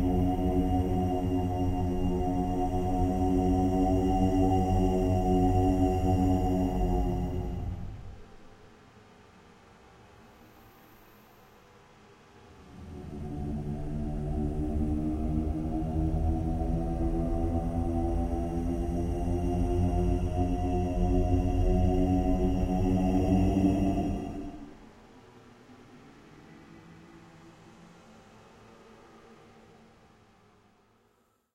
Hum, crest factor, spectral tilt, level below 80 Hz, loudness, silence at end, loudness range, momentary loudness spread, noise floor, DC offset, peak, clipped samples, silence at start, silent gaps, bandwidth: none; 16 dB; -9 dB/octave; -36 dBFS; -29 LUFS; 2.2 s; 13 LU; 10 LU; -70 dBFS; under 0.1%; -14 dBFS; under 0.1%; 0 s; none; 14.5 kHz